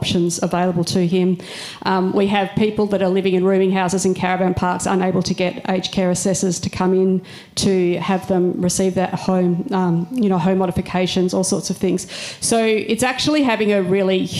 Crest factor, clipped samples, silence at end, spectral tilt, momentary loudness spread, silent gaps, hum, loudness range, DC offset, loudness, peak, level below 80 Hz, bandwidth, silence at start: 12 dB; under 0.1%; 0 s; -5 dB/octave; 4 LU; none; none; 1 LU; under 0.1%; -18 LUFS; -6 dBFS; -48 dBFS; 13.5 kHz; 0 s